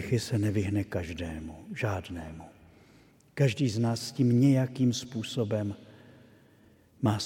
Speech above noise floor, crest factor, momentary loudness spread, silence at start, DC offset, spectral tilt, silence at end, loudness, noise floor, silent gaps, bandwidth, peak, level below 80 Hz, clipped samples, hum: 31 dB; 18 dB; 17 LU; 0 s; under 0.1%; -6.5 dB/octave; 0 s; -29 LUFS; -60 dBFS; none; 16 kHz; -12 dBFS; -56 dBFS; under 0.1%; none